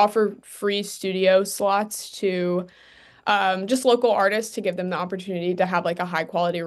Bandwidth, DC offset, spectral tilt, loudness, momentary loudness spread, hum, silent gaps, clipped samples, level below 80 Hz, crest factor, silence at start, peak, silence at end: 12.5 kHz; under 0.1%; -4.5 dB/octave; -23 LUFS; 9 LU; none; none; under 0.1%; -72 dBFS; 16 dB; 0 s; -6 dBFS; 0 s